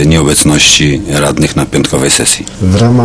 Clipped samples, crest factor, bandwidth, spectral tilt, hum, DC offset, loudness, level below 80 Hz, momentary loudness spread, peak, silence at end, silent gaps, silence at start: 1%; 8 dB; 11 kHz; -3.5 dB/octave; none; under 0.1%; -8 LUFS; -26 dBFS; 7 LU; 0 dBFS; 0 s; none; 0 s